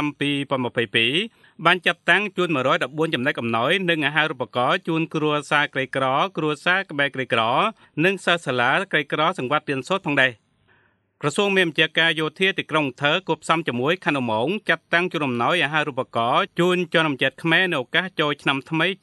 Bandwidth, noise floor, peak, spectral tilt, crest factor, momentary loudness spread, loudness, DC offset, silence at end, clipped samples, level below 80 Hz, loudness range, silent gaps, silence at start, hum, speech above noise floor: 12 kHz; -62 dBFS; -2 dBFS; -5 dB/octave; 20 dB; 5 LU; -21 LUFS; under 0.1%; 0.1 s; under 0.1%; -70 dBFS; 1 LU; none; 0 s; none; 40 dB